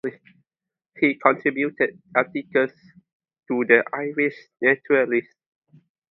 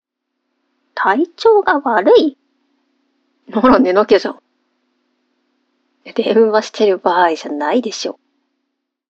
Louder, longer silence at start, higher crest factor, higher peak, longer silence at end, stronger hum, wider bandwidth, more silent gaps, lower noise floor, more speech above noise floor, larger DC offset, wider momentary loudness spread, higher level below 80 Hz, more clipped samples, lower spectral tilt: second, -22 LUFS vs -14 LUFS; second, 0.05 s vs 0.95 s; first, 24 dB vs 16 dB; about the same, 0 dBFS vs 0 dBFS; about the same, 0.9 s vs 1 s; neither; second, 5.8 kHz vs 7.8 kHz; first, 3.12-3.20 s vs none; first, -89 dBFS vs -74 dBFS; first, 67 dB vs 61 dB; neither; second, 8 LU vs 12 LU; second, -72 dBFS vs -52 dBFS; neither; first, -8.5 dB/octave vs -4.5 dB/octave